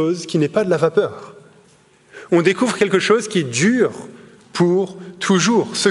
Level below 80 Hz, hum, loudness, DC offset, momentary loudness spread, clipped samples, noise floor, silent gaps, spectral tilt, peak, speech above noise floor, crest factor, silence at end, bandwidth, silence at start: -64 dBFS; none; -17 LUFS; under 0.1%; 10 LU; under 0.1%; -52 dBFS; none; -4.5 dB/octave; 0 dBFS; 35 dB; 18 dB; 0 s; 11.5 kHz; 0 s